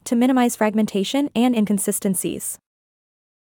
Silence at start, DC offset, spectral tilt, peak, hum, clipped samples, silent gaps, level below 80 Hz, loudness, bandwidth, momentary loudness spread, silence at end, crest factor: 0.05 s; under 0.1%; -4.5 dB/octave; -6 dBFS; none; under 0.1%; none; -62 dBFS; -20 LUFS; 19 kHz; 9 LU; 0.85 s; 14 dB